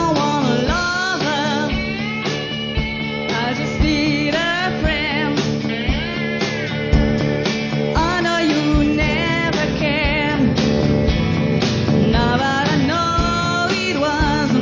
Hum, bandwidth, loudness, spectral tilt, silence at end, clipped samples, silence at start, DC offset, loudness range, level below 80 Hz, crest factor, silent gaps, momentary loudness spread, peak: none; 7.6 kHz; -18 LUFS; -5.5 dB/octave; 0 s; under 0.1%; 0 s; under 0.1%; 3 LU; -28 dBFS; 14 dB; none; 5 LU; -4 dBFS